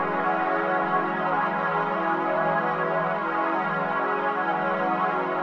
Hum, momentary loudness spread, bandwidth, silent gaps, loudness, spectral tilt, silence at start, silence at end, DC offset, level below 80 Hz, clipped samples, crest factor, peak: none; 1 LU; 7 kHz; none; -25 LUFS; -7.5 dB/octave; 0 s; 0 s; under 0.1%; -68 dBFS; under 0.1%; 12 dB; -12 dBFS